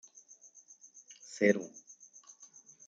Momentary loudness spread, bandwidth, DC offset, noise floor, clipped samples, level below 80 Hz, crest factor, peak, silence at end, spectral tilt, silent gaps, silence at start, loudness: 26 LU; 9 kHz; under 0.1%; -59 dBFS; under 0.1%; -84 dBFS; 26 dB; -12 dBFS; 0.4 s; -5 dB/octave; none; 1.3 s; -31 LUFS